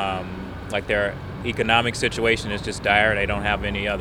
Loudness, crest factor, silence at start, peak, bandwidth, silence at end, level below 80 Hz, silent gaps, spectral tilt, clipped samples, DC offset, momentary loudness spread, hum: -22 LUFS; 22 dB; 0 s; -2 dBFS; 18.5 kHz; 0 s; -38 dBFS; none; -4.5 dB/octave; under 0.1%; under 0.1%; 11 LU; none